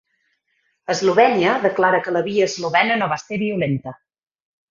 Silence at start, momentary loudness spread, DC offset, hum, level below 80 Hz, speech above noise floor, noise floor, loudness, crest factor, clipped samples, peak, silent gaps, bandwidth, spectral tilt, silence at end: 0.9 s; 10 LU; under 0.1%; none; -62 dBFS; 50 dB; -69 dBFS; -18 LUFS; 18 dB; under 0.1%; -2 dBFS; none; 7.6 kHz; -5 dB/octave; 0.75 s